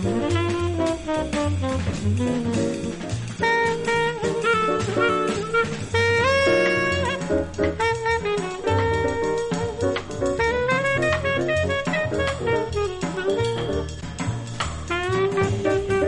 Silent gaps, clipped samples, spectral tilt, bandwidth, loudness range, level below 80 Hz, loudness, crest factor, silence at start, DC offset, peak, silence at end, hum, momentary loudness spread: none; under 0.1%; -5.5 dB/octave; 11.5 kHz; 4 LU; -40 dBFS; -23 LUFS; 14 dB; 0 s; under 0.1%; -8 dBFS; 0 s; none; 6 LU